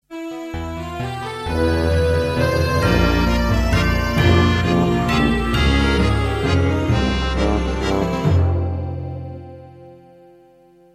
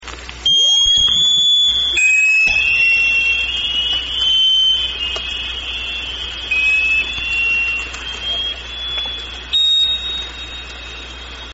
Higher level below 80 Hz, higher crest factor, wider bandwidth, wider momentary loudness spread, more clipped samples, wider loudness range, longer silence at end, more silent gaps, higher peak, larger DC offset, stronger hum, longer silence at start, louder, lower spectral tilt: first, -26 dBFS vs -36 dBFS; about the same, 16 dB vs 12 dB; first, 14.5 kHz vs 8 kHz; second, 12 LU vs 16 LU; neither; about the same, 5 LU vs 7 LU; first, 1 s vs 0 s; neither; about the same, -2 dBFS vs -4 dBFS; neither; neither; about the same, 0.1 s vs 0 s; second, -19 LUFS vs -13 LUFS; first, -6.5 dB/octave vs 2.5 dB/octave